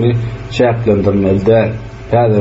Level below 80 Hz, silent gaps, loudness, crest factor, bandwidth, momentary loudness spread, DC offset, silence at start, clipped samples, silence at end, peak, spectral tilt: -34 dBFS; none; -13 LUFS; 10 dB; 7.8 kHz; 8 LU; under 0.1%; 0 s; under 0.1%; 0 s; -2 dBFS; -7 dB/octave